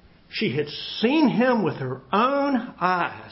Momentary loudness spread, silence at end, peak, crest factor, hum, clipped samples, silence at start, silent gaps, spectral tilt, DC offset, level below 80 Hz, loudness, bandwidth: 8 LU; 0 s; -8 dBFS; 16 dB; none; under 0.1%; 0.3 s; none; -9.5 dB/octave; under 0.1%; -60 dBFS; -23 LUFS; 5.8 kHz